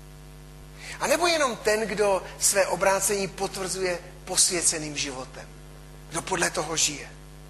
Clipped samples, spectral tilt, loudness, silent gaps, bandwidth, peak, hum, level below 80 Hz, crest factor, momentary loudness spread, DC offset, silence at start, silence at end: under 0.1%; -1.5 dB/octave; -24 LUFS; none; 13 kHz; -6 dBFS; none; -48 dBFS; 20 dB; 17 LU; under 0.1%; 0 s; 0 s